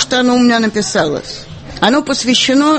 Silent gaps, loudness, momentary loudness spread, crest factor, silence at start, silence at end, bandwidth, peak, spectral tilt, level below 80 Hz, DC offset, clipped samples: none; -13 LUFS; 15 LU; 12 dB; 0 s; 0 s; 8.8 kHz; 0 dBFS; -3 dB/octave; -42 dBFS; under 0.1%; under 0.1%